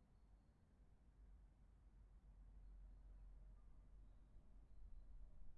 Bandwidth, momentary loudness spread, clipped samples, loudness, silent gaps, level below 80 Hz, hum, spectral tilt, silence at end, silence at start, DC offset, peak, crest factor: 4.3 kHz; 2 LU; under 0.1%; -68 LUFS; none; -64 dBFS; none; -8 dB/octave; 0 s; 0 s; under 0.1%; -48 dBFS; 14 dB